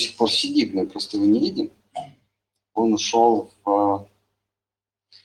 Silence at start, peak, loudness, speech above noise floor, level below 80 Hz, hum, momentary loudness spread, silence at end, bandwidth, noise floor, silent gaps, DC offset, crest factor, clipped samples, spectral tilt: 0 s; -4 dBFS; -21 LUFS; over 69 dB; -64 dBFS; none; 13 LU; 1.2 s; 12 kHz; under -90 dBFS; none; under 0.1%; 18 dB; under 0.1%; -4 dB/octave